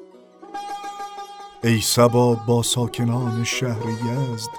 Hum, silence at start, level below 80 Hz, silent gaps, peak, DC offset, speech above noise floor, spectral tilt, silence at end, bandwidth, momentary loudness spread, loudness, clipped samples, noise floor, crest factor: none; 0 s; -56 dBFS; none; -2 dBFS; under 0.1%; 25 dB; -5 dB/octave; 0 s; 18.5 kHz; 18 LU; -21 LUFS; under 0.1%; -45 dBFS; 20 dB